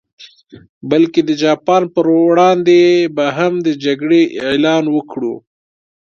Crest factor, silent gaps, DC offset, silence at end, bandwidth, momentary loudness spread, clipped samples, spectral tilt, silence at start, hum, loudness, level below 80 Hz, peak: 14 dB; 0.69-0.81 s; under 0.1%; 0.75 s; 7 kHz; 9 LU; under 0.1%; -6 dB/octave; 0.2 s; none; -13 LUFS; -60 dBFS; 0 dBFS